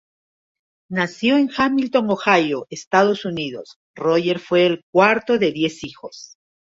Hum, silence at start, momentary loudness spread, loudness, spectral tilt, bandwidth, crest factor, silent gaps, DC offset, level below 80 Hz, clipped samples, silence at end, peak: none; 0.9 s; 15 LU; -19 LUFS; -5.5 dB/octave; 7.8 kHz; 18 dB; 2.87-2.91 s, 3.76-3.94 s, 4.83-4.93 s; under 0.1%; -60 dBFS; under 0.1%; 0.4 s; -2 dBFS